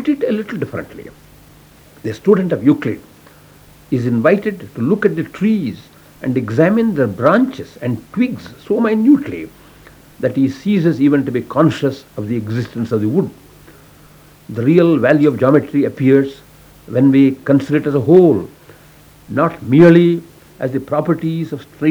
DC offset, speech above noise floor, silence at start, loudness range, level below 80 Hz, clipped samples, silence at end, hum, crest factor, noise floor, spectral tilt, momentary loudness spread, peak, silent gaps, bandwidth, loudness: under 0.1%; 30 dB; 0 s; 5 LU; -52 dBFS; 0.1%; 0 s; none; 16 dB; -44 dBFS; -8.5 dB/octave; 14 LU; 0 dBFS; none; 20 kHz; -15 LUFS